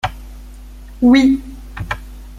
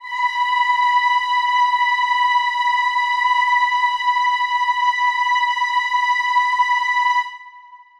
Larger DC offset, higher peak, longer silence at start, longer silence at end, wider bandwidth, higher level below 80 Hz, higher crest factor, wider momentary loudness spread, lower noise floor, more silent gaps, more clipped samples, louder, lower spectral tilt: neither; first, -2 dBFS vs -6 dBFS; about the same, 0.05 s vs 0 s; second, 0 s vs 0.25 s; first, 13 kHz vs 11.5 kHz; first, -34 dBFS vs -66 dBFS; about the same, 16 dB vs 12 dB; first, 21 LU vs 3 LU; second, -35 dBFS vs -44 dBFS; neither; neither; about the same, -15 LUFS vs -17 LUFS; first, -6 dB/octave vs 5 dB/octave